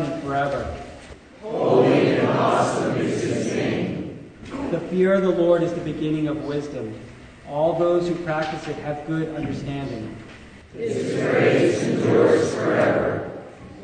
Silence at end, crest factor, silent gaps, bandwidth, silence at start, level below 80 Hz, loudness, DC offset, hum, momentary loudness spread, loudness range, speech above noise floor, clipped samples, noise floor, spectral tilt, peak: 0 s; 18 dB; none; 9.6 kHz; 0 s; -50 dBFS; -22 LUFS; under 0.1%; none; 18 LU; 5 LU; 21 dB; under 0.1%; -43 dBFS; -6.5 dB/octave; -4 dBFS